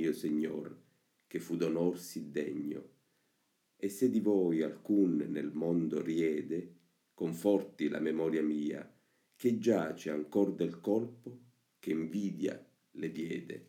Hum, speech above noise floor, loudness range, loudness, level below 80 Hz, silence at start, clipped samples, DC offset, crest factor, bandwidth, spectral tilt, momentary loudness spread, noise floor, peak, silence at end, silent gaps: none; 44 dB; 5 LU; -34 LUFS; -80 dBFS; 0 s; under 0.1%; under 0.1%; 18 dB; 16.5 kHz; -7 dB/octave; 13 LU; -78 dBFS; -16 dBFS; 0.05 s; none